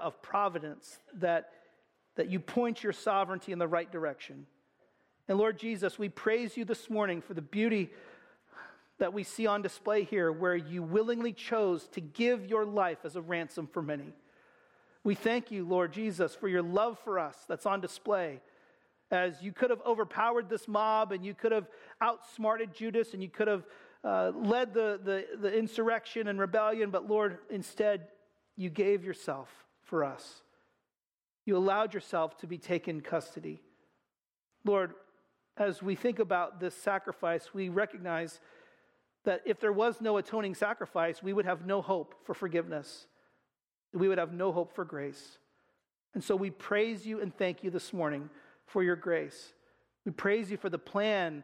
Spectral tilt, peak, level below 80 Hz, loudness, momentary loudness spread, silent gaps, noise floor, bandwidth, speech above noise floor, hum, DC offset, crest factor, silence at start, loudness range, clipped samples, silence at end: -6 dB/octave; -16 dBFS; -80 dBFS; -33 LUFS; 11 LU; 31.14-31.18 s; under -90 dBFS; 15 kHz; over 57 dB; none; under 0.1%; 18 dB; 0 s; 4 LU; under 0.1%; 0 s